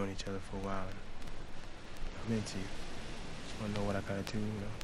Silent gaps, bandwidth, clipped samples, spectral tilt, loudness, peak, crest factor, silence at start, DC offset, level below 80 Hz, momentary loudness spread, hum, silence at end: none; 12 kHz; under 0.1%; -5.5 dB/octave; -41 LUFS; -20 dBFS; 18 dB; 0 s; under 0.1%; -46 dBFS; 12 LU; none; 0 s